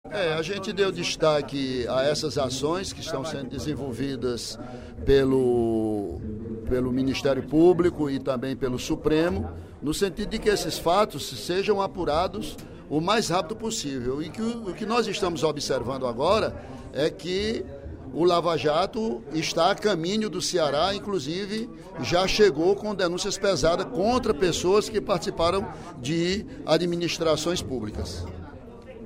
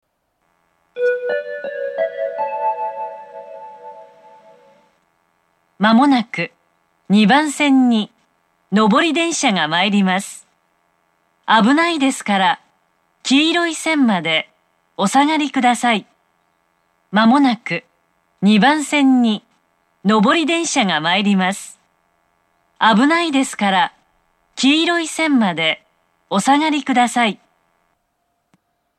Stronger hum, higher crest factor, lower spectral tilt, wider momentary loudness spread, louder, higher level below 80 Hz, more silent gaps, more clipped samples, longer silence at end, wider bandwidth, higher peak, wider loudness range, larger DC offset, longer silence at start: neither; about the same, 18 dB vs 18 dB; about the same, -4.5 dB/octave vs -4 dB/octave; second, 11 LU vs 14 LU; second, -25 LUFS vs -16 LUFS; first, -44 dBFS vs -74 dBFS; neither; neither; second, 0 s vs 1.65 s; first, 16 kHz vs 13 kHz; second, -8 dBFS vs 0 dBFS; second, 3 LU vs 7 LU; neither; second, 0.05 s vs 0.95 s